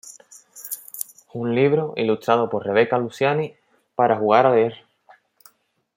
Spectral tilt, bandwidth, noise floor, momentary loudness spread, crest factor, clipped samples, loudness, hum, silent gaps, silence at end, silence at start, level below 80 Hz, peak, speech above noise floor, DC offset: -5.5 dB/octave; 16.5 kHz; -61 dBFS; 16 LU; 22 dB; under 0.1%; -21 LUFS; none; none; 1.2 s; 0.05 s; -70 dBFS; 0 dBFS; 42 dB; under 0.1%